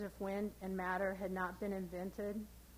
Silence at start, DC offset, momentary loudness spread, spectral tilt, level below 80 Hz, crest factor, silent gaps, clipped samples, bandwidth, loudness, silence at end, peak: 0 s; under 0.1%; 6 LU; -6.5 dB/octave; -60 dBFS; 16 dB; none; under 0.1%; 16.5 kHz; -42 LUFS; 0 s; -26 dBFS